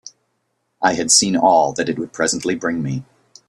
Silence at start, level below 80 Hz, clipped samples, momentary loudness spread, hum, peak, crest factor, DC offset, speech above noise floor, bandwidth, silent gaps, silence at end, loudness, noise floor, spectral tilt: 0.05 s; -58 dBFS; under 0.1%; 11 LU; none; 0 dBFS; 20 dB; under 0.1%; 53 dB; 13 kHz; none; 0.45 s; -17 LUFS; -70 dBFS; -3 dB/octave